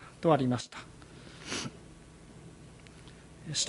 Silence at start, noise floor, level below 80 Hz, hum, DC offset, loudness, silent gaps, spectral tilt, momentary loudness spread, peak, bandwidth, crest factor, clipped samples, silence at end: 0 s; -52 dBFS; -60 dBFS; none; under 0.1%; -32 LUFS; none; -4.5 dB/octave; 24 LU; -12 dBFS; 11.5 kHz; 24 dB; under 0.1%; 0 s